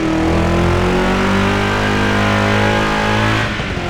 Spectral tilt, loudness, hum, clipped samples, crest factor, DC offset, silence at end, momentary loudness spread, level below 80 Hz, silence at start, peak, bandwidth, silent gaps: -5.5 dB/octave; -15 LUFS; none; under 0.1%; 12 dB; under 0.1%; 0 s; 2 LU; -26 dBFS; 0 s; -2 dBFS; over 20 kHz; none